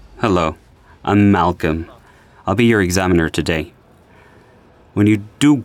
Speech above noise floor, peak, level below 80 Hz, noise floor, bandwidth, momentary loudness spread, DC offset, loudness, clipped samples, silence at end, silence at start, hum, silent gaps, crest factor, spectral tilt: 33 dB; -4 dBFS; -40 dBFS; -48 dBFS; 15.5 kHz; 13 LU; under 0.1%; -17 LUFS; under 0.1%; 0 s; 0.15 s; none; none; 14 dB; -6 dB/octave